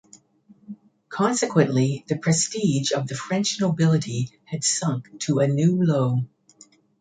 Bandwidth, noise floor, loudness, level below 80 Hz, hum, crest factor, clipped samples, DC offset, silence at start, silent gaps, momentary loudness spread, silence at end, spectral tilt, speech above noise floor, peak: 9.4 kHz; -56 dBFS; -23 LUFS; -64 dBFS; none; 20 dB; under 0.1%; under 0.1%; 0.7 s; none; 10 LU; 0.75 s; -5 dB/octave; 34 dB; -4 dBFS